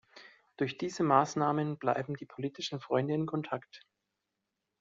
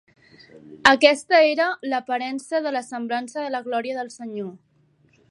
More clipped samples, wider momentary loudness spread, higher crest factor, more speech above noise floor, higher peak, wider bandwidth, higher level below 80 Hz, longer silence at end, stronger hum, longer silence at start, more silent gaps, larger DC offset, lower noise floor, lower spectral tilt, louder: neither; second, 12 LU vs 17 LU; about the same, 24 dB vs 22 dB; first, 54 dB vs 39 dB; second, -10 dBFS vs 0 dBFS; second, 7.6 kHz vs 11.5 kHz; second, -76 dBFS vs -66 dBFS; first, 1 s vs 0.75 s; neither; second, 0.15 s vs 0.55 s; neither; neither; first, -86 dBFS vs -61 dBFS; first, -5 dB/octave vs -3 dB/octave; second, -33 LUFS vs -21 LUFS